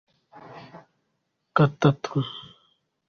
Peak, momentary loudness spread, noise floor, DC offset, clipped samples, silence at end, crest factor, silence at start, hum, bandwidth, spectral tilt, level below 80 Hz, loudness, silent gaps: -6 dBFS; 25 LU; -76 dBFS; under 0.1%; under 0.1%; 0.7 s; 22 dB; 0.5 s; none; 6.8 kHz; -7.5 dB/octave; -62 dBFS; -24 LUFS; none